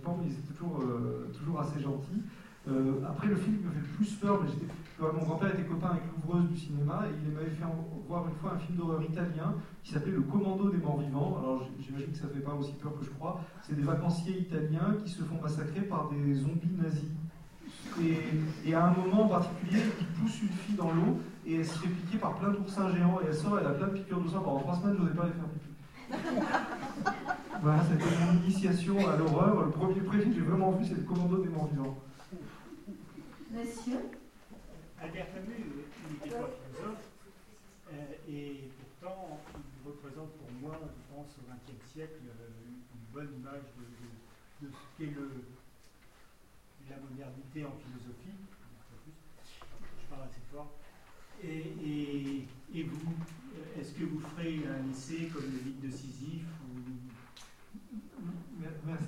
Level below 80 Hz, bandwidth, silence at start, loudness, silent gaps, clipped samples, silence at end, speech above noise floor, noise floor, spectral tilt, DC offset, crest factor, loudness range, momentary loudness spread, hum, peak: -60 dBFS; 12 kHz; 0 s; -34 LUFS; none; under 0.1%; 0 s; 28 dB; -61 dBFS; -7.5 dB/octave; under 0.1%; 22 dB; 19 LU; 21 LU; none; -14 dBFS